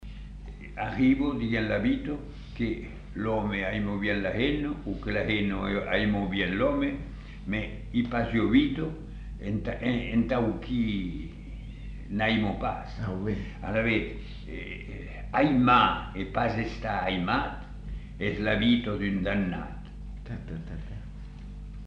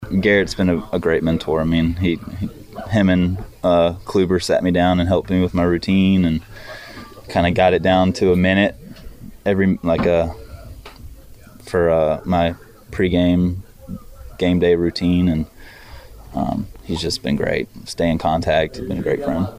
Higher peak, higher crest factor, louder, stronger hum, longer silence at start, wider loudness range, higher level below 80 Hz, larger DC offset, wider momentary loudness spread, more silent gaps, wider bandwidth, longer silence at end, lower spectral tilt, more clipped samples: second, -8 dBFS vs -2 dBFS; about the same, 20 dB vs 16 dB; second, -28 LUFS vs -18 LUFS; first, 50 Hz at -40 dBFS vs none; about the same, 0 s vs 0 s; about the same, 4 LU vs 4 LU; about the same, -40 dBFS vs -38 dBFS; neither; about the same, 18 LU vs 19 LU; neither; second, 7.4 kHz vs 15.5 kHz; about the same, 0 s vs 0 s; about the same, -7.5 dB/octave vs -7 dB/octave; neither